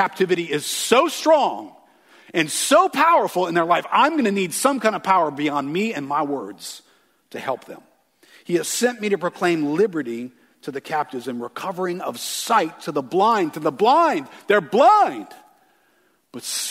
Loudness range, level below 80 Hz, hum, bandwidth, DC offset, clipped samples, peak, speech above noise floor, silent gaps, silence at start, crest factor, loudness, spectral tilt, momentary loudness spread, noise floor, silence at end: 7 LU; -74 dBFS; none; 16 kHz; under 0.1%; under 0.1%; 0 dBFS; 42 dB; none; 0 s; 20 dB; -20 LUFS; -3.5 dB/octave; 15 LU; -62 dBFS; 0 s